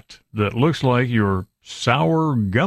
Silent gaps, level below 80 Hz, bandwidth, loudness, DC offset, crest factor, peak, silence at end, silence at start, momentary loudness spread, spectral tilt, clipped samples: none; -50 dBFS; 13 kHz; -20 LUFS; under 0.1%; 16 dB; -4 dBFS; 0 s; 0.1 s; 9 LU; -6.5 dB/octave; under 0.1%